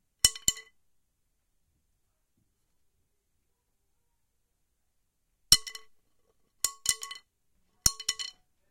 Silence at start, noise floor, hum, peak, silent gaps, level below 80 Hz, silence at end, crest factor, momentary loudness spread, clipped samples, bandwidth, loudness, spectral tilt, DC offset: 0.25 s; -77 dBFS; none; 0 dBFS; none; -54 dBFS; 0.4 s; 34 dB; 21 LU; under 0.1%; 16.5 kHz; -27 LUFS; 1 dB/octave; under 0.1%